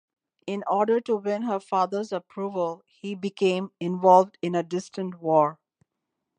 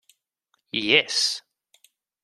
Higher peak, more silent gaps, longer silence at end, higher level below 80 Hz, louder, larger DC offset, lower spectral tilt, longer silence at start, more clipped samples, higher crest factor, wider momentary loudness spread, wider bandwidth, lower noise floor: about the same, -4 dBFS vs -2 dBFS; neither; about the same, 0.85 s vs 0.85 s; second, -80 dBFS vs -74 dBFS; second, -25 LUFS vs -21 LUFS; neither; first, -6.5 dB/octave vs -1 dB/octave; second, 0.45 s vs 0.75 s; neither; second, 20 dB vs 26 dB; about the same, 14 LU vs 13 LU; second, 10 kHz vs 14 kHz; first, -82 dBFS vs -73 dBFS